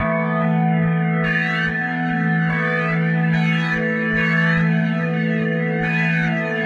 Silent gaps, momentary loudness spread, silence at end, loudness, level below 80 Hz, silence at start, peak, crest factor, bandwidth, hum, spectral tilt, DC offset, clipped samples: none; 3 LU; 0 s; -19 LUFS; -48 dBFS; 0 s; -8 dBFS; 12 dB; 6.6 kHz; none; -8 dB/octave; under 0.1%; under 0.1%